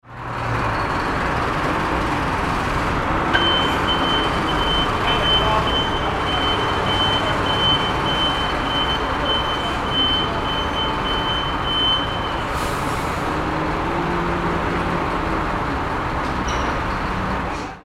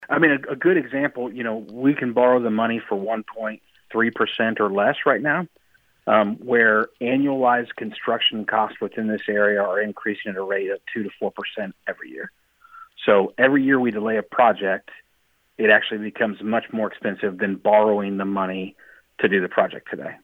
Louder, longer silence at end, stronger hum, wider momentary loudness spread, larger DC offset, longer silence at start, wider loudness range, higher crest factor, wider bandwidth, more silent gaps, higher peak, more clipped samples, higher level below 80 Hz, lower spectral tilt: about the same, -20 LUFS vs -21 LUFS; about the same, 0 s vs 0.05 s; neither; second, 6 LU vs 13 LU; neither; about the same, 0.05 s vs 0 s; about the same, 4 LU vs 4 LU; about the same, 18 dB vs 20 dB; about the same, 16 kHz vs 16.5 kHz; neither; about the same, -2 dBFS vs -2 dBFS; neither; first, -32 dBFS vs -72 dBFS; second, -4.5 dB/octave vs -7.5 dB/octave